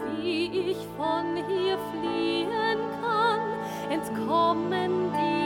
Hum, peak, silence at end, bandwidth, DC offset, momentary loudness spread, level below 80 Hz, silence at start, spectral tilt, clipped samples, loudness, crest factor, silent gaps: none; -12 dBFS; 0 s; 18 kHz; under 0.1%; 6 LU; -62 dBFS; 0 s; -5.5 dB/octave; under 0.1%; -27 LUFS; 16 dB; none